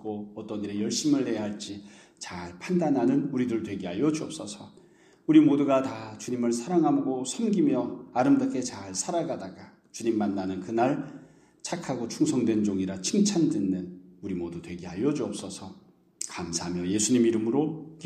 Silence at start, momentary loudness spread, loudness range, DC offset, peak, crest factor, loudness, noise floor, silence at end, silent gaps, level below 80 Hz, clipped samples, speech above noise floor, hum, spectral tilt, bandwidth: 0 s; 15 LU; 5 LU; under 0.1%; -8 dBFS; 20 dB; -27 LUFS; -57 dBFS; 0 s; none; -66 dBFS; under 0.1%; 31 dB; none; -5 dB/octave; 13 kHz